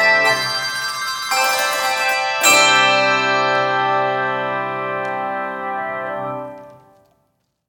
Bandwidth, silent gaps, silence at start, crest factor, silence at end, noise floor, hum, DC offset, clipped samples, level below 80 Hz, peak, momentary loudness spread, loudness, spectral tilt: 18 kHz; none; 0 s; 18 dB; 0.95 s; -67 dBFS; none; under 0.1%; under 0.1%; -68 dBFS; 0 dBFS; 13 LU; -17 LUFS; -1 dB/octave